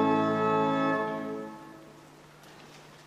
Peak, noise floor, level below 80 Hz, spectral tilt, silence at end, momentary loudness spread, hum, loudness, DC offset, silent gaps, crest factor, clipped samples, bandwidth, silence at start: -12 dBFS; -53 dBFS; -70 dBFS; -7 dB/octave; 0.05 s; 24 LU; none; -28 LUFS; under 0.1%; none; 18 dB; under 0.1%; 13 kHz; 0 s